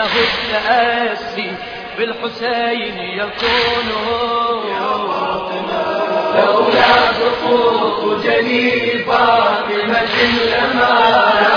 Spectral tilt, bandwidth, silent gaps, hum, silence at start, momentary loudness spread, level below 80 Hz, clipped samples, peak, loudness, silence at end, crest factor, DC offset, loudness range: -4.5 dB/octave; 5.4 kHz; none; none; 0 s; 10 LU; -46 dBFS; under 0.1%; 0 dBFS; -15 LUFS; 0 s; 16 dB; under 0.1%; 5 LU